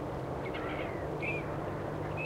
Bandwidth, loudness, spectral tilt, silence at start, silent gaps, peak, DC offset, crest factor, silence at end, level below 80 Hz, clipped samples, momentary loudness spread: 16 kHz; -37 LUFS; -7 dB/octave; 0 s; none; -24 dBFS; under 0.1%; 14 dB; 0 s; -52 dBFS; under 0.1%; 3 LU